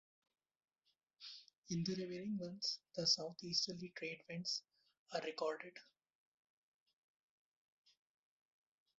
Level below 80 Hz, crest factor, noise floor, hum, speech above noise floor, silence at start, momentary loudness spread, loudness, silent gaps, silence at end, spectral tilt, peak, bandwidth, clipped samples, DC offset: -84 dBFS; 24 dB; -86 dBFS; none; 42 dB; 1.2 s; 18 LU; -42 LUFS; 1.58-1.62 s, 4.99-5.06 s; 3.15 s; -3 dB/octave; -24 dBFS; 7.6 kHz; under 0.1%; under 0.1%